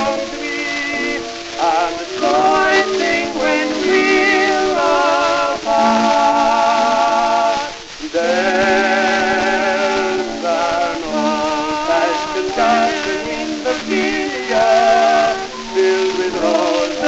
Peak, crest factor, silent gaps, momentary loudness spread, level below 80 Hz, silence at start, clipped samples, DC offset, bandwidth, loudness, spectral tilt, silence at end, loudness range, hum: -2 dBFS; 14 dB; none; 8 LU; -46 dBFS; 0 s; under 0.1%; under 0.1%; 8.4 kHz; -16 LUFS; -3 dB/octave; 0 s; 3 LU; none